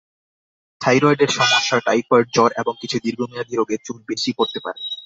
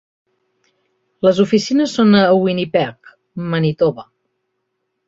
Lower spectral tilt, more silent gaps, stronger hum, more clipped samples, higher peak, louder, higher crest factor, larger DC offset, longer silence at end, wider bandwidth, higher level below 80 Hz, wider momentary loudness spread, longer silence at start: second, -4 dB/octave vs -6.5 dB/octave; neither; neither; neither; about the same, -2 dBFS vs -2 dBFS; second, -19 LUFS vs -15 LUFS; about the same, 18 dB vs 16 dB; neither; second, 0 s vs 1.05 s; about the same, 7.8 kHz vs 7.8 kHz; second, -62 dBFS vs -56 dBFS; about the same, 11 LU vs 13 LU; second, 0.8 s vs 1.25 s